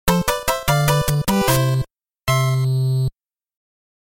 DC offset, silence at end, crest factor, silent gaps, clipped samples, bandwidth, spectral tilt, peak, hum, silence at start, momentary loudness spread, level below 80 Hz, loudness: under 0.1%; 0.9 s; 18 dB; none; under 0.1%; 17 kHz; -5 dB/octave; -2 dBFS; none; 0.05 s; 7 LU; -36 dBFS; -19 LUFS